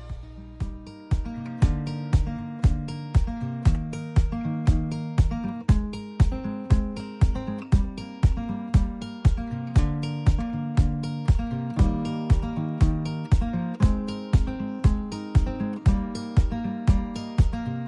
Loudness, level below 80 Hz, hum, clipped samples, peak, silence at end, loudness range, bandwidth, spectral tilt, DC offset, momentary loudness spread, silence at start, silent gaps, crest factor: -26 LUFS; -28 dBFS; none; under 0.1%; -10 dBFS; 0 s; 1 LU; 10.5 kHz; -8 dB/octave; under 0.1%; 6 LU; 0 s; none; 14 dB